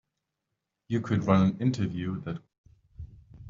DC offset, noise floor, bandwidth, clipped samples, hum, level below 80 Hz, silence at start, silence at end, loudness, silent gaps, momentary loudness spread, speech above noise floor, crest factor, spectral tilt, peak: under 0.1%; -84 dBFS; 7.6 kHz; under 0.1%; none; -58 dBFS; 0.9 s; 0 s; -28 LUFS; 2.58-2.64 s; 24 LU; 57 dB; 22 dB; -7.5 dB/octave; -8 dBFS